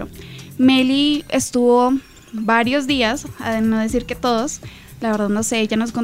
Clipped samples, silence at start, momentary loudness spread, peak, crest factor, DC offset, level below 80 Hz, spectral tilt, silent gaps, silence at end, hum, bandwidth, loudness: under 0.1%; 0 s; 14 LU; -2 dBFS; 16 dB; 0.4%; -44 dBFS; -4 dB/octave; none; 0 s; none; 16 kHz; -18 LUFS